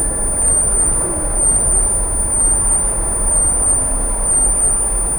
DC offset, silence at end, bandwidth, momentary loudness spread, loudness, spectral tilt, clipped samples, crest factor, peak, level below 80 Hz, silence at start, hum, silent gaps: under 0.1%; 0 s; 19 kHz; 4 LU; -13 LUFS; -3.5 dB/octave; under 0.1%; 12 dB; -2 dBFS; -22 dBFS; 0 s; none; none